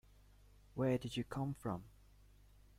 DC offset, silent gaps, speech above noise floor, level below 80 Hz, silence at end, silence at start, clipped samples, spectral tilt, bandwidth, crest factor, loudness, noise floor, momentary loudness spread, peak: under 0.1%; none; 25 dB; -64 dBFS; 0.9 s; 0.75 s; under 0.1%; -7 dB/octave; 16 kHz; 20 dB; -42 LUFS; -65 dBFS; 13 LU; -24 dBFS